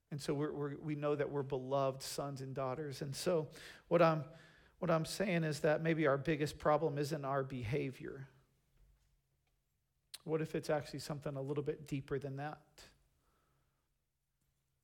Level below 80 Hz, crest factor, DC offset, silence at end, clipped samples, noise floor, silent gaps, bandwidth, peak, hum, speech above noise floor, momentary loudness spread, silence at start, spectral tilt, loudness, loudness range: -68 dBFS; 22 dB; under 0.1%; 1.95 s; under 0.1%; -85 dBFS; none; 17.5 kHz; -18 dBFS; none; 48 dB; 12 LU; 0.1 s; -6 dB/octave; -38 LUFS; 9 LU